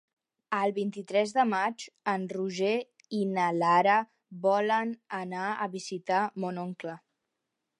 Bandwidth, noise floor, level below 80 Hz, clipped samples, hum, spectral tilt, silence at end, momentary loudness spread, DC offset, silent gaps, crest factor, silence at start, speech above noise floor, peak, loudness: 11.5 kHz; -84 dBFS; -84 dBFS; under 0.1%; none; -5.5 dB/octave; 0.85 s; 12 LU; under 0.1%; none; 18 dB; 0.5 s; 56 dB; -10 dBFS; -29 LUFS